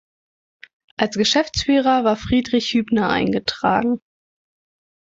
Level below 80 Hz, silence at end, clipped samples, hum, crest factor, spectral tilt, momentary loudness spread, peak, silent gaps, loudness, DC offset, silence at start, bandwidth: -44 dBFS; 1.15 s; under 0.1%; none; 18 dB; -4.5 dB/octave; 7 LU; -4 dBFS; none; -19 LUFS; under 0.1%; 1 s; 7.8 kHz